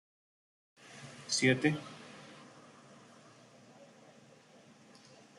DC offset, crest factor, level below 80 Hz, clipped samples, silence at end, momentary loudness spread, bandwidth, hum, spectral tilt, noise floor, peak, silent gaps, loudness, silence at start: under 0.1%; 26 dB; -80 dBFS; under 0.1%; 2.95 s; 29 LU; 11.5 kHz; none; -4 dB/octave; -60 dBFS; -14 dBFS; none; -31 LUFS; 0.9 s